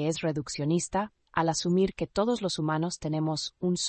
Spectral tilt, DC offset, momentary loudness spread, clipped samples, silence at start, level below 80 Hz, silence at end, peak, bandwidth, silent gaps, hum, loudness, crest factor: -5 dB/octave; under 0.1%; 5 LU; under 0.1%; 0 s; -56 dBFS; 0 s; -12 dBFS; 8.8 kHz; none; none; -29 LUFS; 18 dB